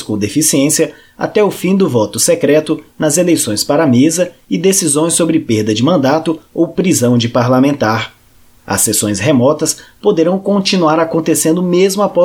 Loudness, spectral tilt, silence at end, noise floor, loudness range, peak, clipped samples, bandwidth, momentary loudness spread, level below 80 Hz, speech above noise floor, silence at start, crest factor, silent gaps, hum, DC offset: -12 LUFS; -4.5 dB/octave; 0 s; -45 dBFS; 1 LU; 0 dBFS; under 0.1%; 18 kHz; 6 LU; -50 dBFS; 33 dB; 0 s; 12 dB; none; none; under 0.1%